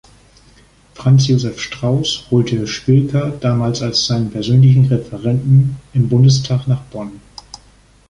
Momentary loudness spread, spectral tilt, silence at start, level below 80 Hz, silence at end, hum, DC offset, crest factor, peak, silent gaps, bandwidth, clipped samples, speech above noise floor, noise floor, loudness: 10 LU; -6.5 dB/octave; 1 s; -44 dBFS; 0.55 s; none; under 0.1%; 14 dB; -2 dBFS; none; 9.4 kHz; under 0.1%; 34 dB; -48 dBFS; -15 LUFS